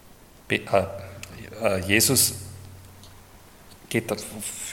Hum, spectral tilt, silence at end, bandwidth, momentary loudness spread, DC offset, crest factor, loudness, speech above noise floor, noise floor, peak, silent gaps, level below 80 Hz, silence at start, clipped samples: none; -3 dB/octave; 0 s; 17.5 kHz; 22 LU; under 0.1%; 24 dB; -23 LUFS; 26 dB; -50 dBFS; -2 dBFS; none; -56 dBFS; 0.05 s; under 0.1%